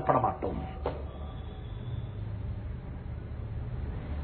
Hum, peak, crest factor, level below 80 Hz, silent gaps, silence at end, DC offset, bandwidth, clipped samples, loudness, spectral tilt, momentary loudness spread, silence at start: none; -10 dBFS; 24 dB; -40 dBFS; none; 0 s; under 0.1%; 4.5 kHz; under 0.1%; -36 LUFS; -7.5 dB/octave; 10 LU; 0 s